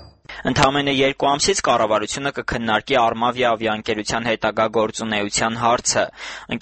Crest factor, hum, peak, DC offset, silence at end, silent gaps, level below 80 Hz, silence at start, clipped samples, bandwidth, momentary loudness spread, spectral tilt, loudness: 20 dB; none; 0 dBFS; under 0.1%; 0 s; none; -46 dBFS; 0 s; under 0.1%; 8.8 kHz; 7 LU; -3 dB/octave; -19 LUFS